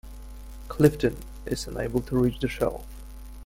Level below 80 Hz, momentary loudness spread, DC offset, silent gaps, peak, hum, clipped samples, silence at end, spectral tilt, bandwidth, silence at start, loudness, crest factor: -40 dBFS; 23 LU; under 0.1%; none; -4 dBFS; none; under 0.1%; 0 s; -6.5 dB/octave; 16.5 kHz; 0.05 s; -26 LUFS; 24 dB